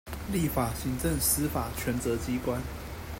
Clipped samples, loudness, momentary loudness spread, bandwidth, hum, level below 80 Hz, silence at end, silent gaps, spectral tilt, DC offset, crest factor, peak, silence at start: under 0.1%; -30 LUFS; 8 LU; 16.5 kHz; none; -42 dBFS; 0 s; none; -4.5 dB/octave; under 0.1%; 18 dB; -12 dBFS; 0.05 s